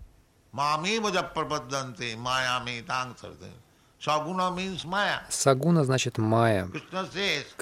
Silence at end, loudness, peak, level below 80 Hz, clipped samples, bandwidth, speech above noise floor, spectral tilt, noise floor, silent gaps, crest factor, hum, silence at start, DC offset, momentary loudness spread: 0.1 s; -27 LUFS; -6 dBFS; -60 dBFS; under 0.1%; 16 kHz; 29 dB; -4.5 dB/octave; -56 dBFS; none; 22 dB; none; 0 s; under 0.1%; 11 LU